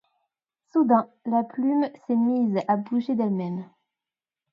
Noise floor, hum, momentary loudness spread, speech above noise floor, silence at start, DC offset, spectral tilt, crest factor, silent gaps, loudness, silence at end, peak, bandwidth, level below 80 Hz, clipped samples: under -90 dBFS; none; 7 LU; over 66 dB; 0.75 s; under 0.1%; -9.5 dB/octave; 20 dB; none; -24 LUFS; 0.9 s; -6 dBFS; 5.4 kHz; -76 dBFS; under 0.1%